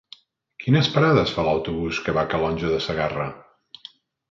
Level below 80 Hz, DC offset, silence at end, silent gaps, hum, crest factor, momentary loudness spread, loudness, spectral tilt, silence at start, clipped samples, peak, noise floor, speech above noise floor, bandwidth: -46 dBFS; under 0.1%; 0.9 s; none; none; 20 dB; 14 LU; -22 LUFS; -6.5 dB/octave; 0.6 s; under 0.1%; -4 dBFS; -50 dBFS; 29 dB; 7.4 kHz